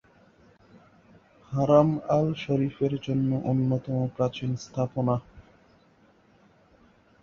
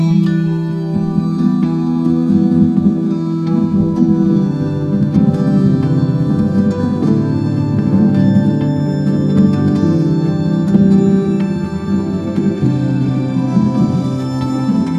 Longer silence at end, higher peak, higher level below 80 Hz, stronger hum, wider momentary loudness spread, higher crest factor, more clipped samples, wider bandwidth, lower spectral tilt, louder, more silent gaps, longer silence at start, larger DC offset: first, 1.8 s vs 0 s; second, -6 dBFS vs 0 dBFS; second, -58 dBFS vs -38 dBFS; neither; first, 10 LU vs 5 LU; first, 22 dB vs 12 dB; neither; about the same, 7 kHz vs 7.6 kHz; about the same, -8.5 dB/octave vs -9.5 dB/octave; second, -26 LUFS vs -14 LUFS; neither; first, 1.5 s vs 0 s; neither